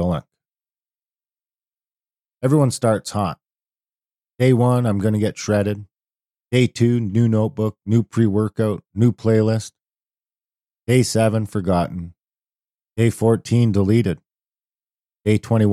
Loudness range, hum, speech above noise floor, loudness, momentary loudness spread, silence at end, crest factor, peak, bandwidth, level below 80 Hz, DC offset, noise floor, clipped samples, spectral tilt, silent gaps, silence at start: 4 LU; none; over 72 dB; -19 LUFS; 10 LU; 0 s; 16 dB; -4 dBFS; 13 kHz; -52 dBFS; under 0.1%; under -90 dBFS; under 0.1%; -7 dB/octave; none; 0 s